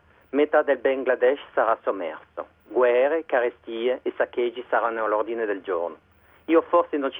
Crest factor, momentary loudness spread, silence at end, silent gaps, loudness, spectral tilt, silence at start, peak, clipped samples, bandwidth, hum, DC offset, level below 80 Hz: 18 dB; 10 LU; 0 s; none; -24 LUFS; -7.5 dB/octave; 0.35 s; -6 dBFS; under 0.1%; 3.8 kHz; none; under 0.1%; -68 dBFS